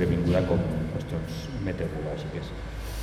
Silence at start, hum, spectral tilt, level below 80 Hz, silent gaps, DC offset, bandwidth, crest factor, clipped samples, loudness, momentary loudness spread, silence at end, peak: 0 s; none; -7.5 dB/octave; -38 dBFS; none; under 0.1%; 14.5 kHz; 16 dB; under 0.1%; -30 LUFS; 12 LU; 0 s; -12 dBFS